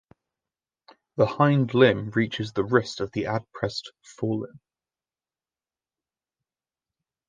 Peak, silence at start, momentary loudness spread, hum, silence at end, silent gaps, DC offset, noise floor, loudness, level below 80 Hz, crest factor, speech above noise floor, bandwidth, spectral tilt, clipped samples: -4 dBFS; 1.15 s; 14 LU; none; 2.7 s; none; under 0.1%; under -90 dBFS; -25 LUFS; -60 dBFS; 24 dB; over 66 dB; 9.4 kHz; -7 dB/octave; under 0.1%